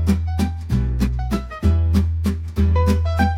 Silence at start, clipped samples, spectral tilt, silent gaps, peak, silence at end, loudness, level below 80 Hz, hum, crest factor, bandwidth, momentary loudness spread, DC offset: 0 s; under 0.1%; -7.5 dB/octave; none; -4 dBFS; 0 s; -20 LUFS; -26 dBFS; none; 14 dB; 13.5 kHz; 6 LU; under 0.1%